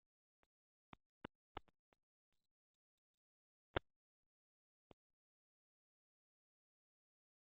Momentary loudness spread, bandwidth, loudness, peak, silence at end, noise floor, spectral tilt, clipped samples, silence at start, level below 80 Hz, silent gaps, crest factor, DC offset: 20 LU; 3.8 kHz; -52 LUFS; -24 dBFS; 3.65 s; under -90 dBFS; -2.5 dB/octave; under 0.1%; 3.75 s; -72 dBFS; none; 36 dB; under 0.1%